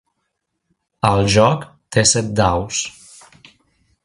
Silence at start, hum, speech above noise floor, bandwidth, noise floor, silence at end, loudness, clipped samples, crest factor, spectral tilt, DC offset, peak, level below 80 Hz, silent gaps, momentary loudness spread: 1.05 s; none; 58 dB; 11.5 kHz; -74 dBFS; 1.15 s; -16 LUFS; under 0.1%; 20 dB; -4 dB/octave; under 0.1%; 0 dBFS; -40 dBFS; none; 9 LU